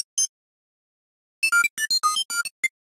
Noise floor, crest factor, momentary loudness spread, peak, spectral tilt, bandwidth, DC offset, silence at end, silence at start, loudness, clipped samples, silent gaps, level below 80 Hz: under -90 dBFS; 16 dB; 7 LU; -10 dBFS; 4.5 dB/octave; 16 kHz; under 0.1%; 0.3 s; 0.15 s; -22 LUFS; under 0.1%; 0.29-1.42 s, 1.70-1.77 s, 2.25-2.29 s, 2.51-2.63 s; -86 dBFS